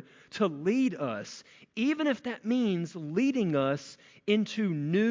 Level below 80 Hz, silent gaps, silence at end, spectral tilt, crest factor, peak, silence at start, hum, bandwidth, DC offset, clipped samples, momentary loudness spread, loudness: -76 dBFS; none; 0 s; -6.5 dB/octave; 16 dB; -14 dBFS; 0.35 s; none; 7.6 kHz; under 0.1%; under 0.1%; 13 LU; -30 LUFS